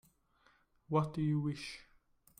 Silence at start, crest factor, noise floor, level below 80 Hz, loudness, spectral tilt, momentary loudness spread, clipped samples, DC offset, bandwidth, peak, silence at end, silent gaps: 0.9 s; 20 dB; -71 dBFS; -68 dBFS; -37 LUFS; -7.5 dB/octave; 13 LU; under 0.1%; under 0.1%; 11 kHz; -20 dBFS; 0.6 s; none